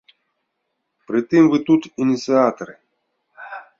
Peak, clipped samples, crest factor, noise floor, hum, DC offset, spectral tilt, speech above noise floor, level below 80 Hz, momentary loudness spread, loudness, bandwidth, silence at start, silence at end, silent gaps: -2 dBFS; under 0.1%; 18 dB; -75 dBFS; none; under 0.1%; -6.5 dB/octave; 58 dB; -64 dBFS; 21 LU; -17 LUFS; 7.4 kHz; 1.1 s; 0.2 s; none